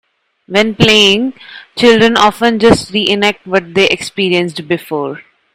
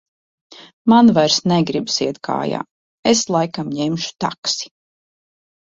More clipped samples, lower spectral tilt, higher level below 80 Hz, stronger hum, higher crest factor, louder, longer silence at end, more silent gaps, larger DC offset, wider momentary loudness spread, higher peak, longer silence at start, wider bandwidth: first, 0.6% vs under 0.1%; about the same, -4 dB/octave vs -4.5 dB/octave; first, -42 dBFS vs -58 dBFS; neither; second, 12 dB vs 18 dB; first, -11 LUFS vs -18 LUFS; second, 0.35 s vs 1.05 s; second, none vs 0.73-0.85 s, 2.71-3.03 s, 4.38-4.43 s; neither; about the same, 12 LU vs 12 LU; about the same, 0 dBFS vs -2 dBFS; about the same, 0.5 s vs 0.6 s; first, 16.5 kHz vs 7.8 kHz